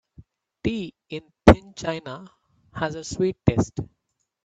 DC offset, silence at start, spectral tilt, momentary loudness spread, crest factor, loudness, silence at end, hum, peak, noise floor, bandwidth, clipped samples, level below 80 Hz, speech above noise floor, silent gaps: under 0.1%; 0.2 s; -6.5 dB/octave; 21 LU; 24 dB; -23 LUFS; 0.6 s; none; 0 dBFS; -77 dBFS; 9.6 kHz; under 0.1%; -38 dBFS; 51 dB; none